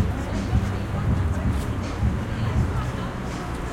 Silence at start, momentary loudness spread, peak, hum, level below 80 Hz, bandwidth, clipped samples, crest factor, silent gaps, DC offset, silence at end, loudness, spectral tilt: 0 s; 6 LU; -8 dBFS; none; -30 dBFS; 15 kHz; under 0.1%; 16 dB; none; under 0.1%; 0 s; -26 LUFS; -7 dB/octave